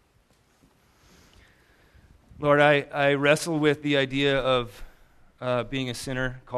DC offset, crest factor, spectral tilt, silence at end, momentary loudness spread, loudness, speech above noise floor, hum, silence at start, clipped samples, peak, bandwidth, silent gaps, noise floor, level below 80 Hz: under 0.1%; 22 dB; -5 dB/octave; 0 s; 11 LU; -24 LUFS; 40 dB; none; 2.4 s; under 0.1%; -4 dBFS; 14 kHz; none; -63 dBFS; -50 dBFS